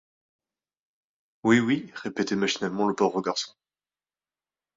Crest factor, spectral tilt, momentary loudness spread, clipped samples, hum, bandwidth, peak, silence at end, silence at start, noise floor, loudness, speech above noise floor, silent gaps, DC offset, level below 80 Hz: 22 dB; -4.5 dB/octave; 9 LU; under 0.1%; none; 7.8 kHz; -8 dBFS; 1.3 s; 1.45 s; under -90 dBFS; -26 LUFS; over 65 dB; none; under 0.1%; -68 dBFS